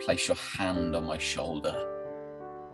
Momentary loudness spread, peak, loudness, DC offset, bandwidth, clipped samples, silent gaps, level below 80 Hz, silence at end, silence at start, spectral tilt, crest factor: 13 LU; -12 dBFS; -32 LUFS; under 0.1%; 12.5 kHz; under 0.1%; none; -52 dBFS; 0 s; 0 s; -4 dB/octave; 20 dB